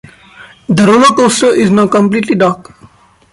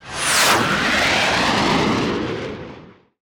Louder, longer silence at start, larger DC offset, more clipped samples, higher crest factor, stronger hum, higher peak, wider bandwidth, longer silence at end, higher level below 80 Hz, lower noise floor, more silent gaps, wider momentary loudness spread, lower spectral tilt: first, -9 LUFS vs -17 LUFS; first, 0.4 s vs 0.05 s; neither; neither; about the same, 10 dB vs 14 dB; neither; first, 0 dBFS vs -6 dBFS; second, 11.5 kHz vs over 20 kHz; first, 0.7 s vs 0.35 s; about the same, -48 dBFS vs -44 dBFS; about the same, -43 dBFS vs -42 dBFS; neither; second, 8 LU vs 15 LU; first, -5 dB/octave vs -2.5 dB/octave